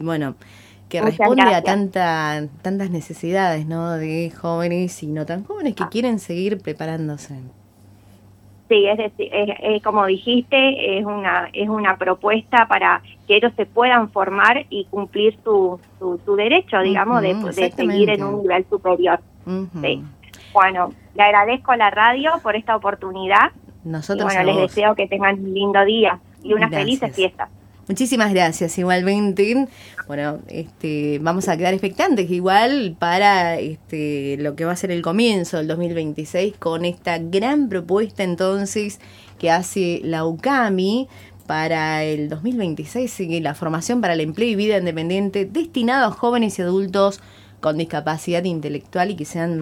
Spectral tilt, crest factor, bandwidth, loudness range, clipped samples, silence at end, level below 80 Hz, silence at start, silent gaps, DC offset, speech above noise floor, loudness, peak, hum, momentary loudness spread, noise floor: -5 dB/octave; 20 dB; 16.5 kHz; 6 LU; under 0.1%; 0 s; -56 dBFS; 0 s; none; under 0.1%; 29 dB; -19 LUFS; 0 dBFS; none; 11 LU; -48 dBFS